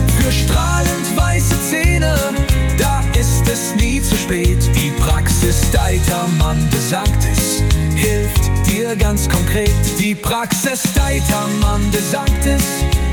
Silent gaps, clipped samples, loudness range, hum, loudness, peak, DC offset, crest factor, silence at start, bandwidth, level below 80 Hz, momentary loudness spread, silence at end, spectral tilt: none; under 0.1%; 1 LU; none; -15 LUFS; -2 dBFS; under 0.1%; 12 dB; 0 s; 19 kHz; -18 dBFS; 2 LU; 0 s; -4.5 dB/octave